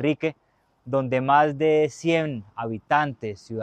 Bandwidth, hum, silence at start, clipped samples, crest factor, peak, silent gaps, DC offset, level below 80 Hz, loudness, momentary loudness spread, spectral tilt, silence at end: 9.2 kHz; none; 0 s; under 0.1%; 18 dB; -6 dBFS; none; under 0.1%; -62 dBFS; -23 LUFS; 13 LU; -6.5 dB/octave; 0 s